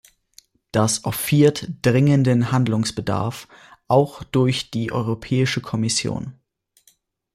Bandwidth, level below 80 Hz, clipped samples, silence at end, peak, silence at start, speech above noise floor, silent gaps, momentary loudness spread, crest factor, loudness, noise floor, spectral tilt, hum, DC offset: 15.5 kHz; -52 dBFS; under 0.1%; 1 s; -4 dBFS; 0.75 s; 41 dB; none; 9 LU; 18 dB; -20 LUFS; -61 dBFS; -5.5 dB/octave; none; under 0.1%